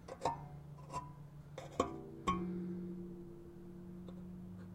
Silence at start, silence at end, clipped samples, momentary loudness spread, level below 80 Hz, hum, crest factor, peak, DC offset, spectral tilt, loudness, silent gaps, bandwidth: 0 s; 0 s; under 0.1%; 13 LU; -62 dBFS; none; 26 dB; -18 dBFS; under 0.1%; -6.5 dB/octave; -45 LUFS; none; 15.5 kHz